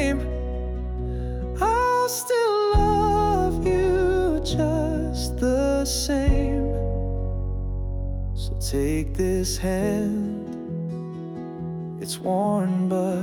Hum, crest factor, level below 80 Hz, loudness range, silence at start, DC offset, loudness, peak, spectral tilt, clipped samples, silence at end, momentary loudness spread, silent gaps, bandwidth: none; 14 dB; -30 dBFS; 5 LU; 0 s; under 0.1%; -24 LUFS; -10 dBFS; -5.5 dB/octave; under 0.1%; 0 s; 10 LU; none; 20 kHz